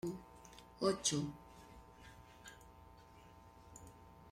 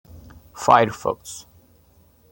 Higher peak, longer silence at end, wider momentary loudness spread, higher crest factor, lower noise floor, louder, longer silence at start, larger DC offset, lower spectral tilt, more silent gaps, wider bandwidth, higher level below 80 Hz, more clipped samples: second, -20 dBFS vs -2 dBFS; second, 0 s vs 0.9 s; first, 25 LU vs 21 LU; about the same, 24 dB vs 22 dB; first, -61 dBFS vs -56 dBFS; second, -39 LUFS vs -20 LUFS; about the same, 0.05 s vs 0.15 s; neither; about the same, -3.5 dB/octave vs -4.5 dB/octave; neither; about the same, 16 kHz vs 17 kHz; second, -66 dBFS vs -56 dBFS; neither